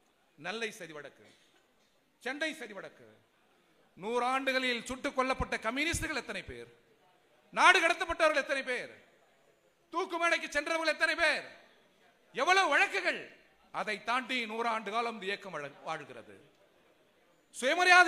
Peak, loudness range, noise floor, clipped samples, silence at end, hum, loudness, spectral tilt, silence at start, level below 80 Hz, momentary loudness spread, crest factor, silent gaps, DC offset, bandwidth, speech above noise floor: -6 dBFS; 9 LU; -71 dBFS; under 0.1%; 0 s; none; -31 LUFS; -2.5 dB/octave; 0.4 s; -60 dBFS; 20 LU; 28 dB; none; under 0.1%; 15.5 kHz; 39 dB